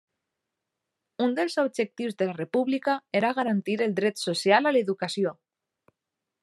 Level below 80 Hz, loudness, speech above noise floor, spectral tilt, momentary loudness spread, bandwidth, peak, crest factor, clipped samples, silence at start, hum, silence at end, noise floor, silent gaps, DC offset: -82 dBFS; -26 LUFS; 60 dB; -5 dB/octave; 8 LU; 12.5 kHz; -6 dBFS; 22 dB; under 0.1%; 1.2 s; none; 1.1 s; -86 dBFS; none; under 0.1%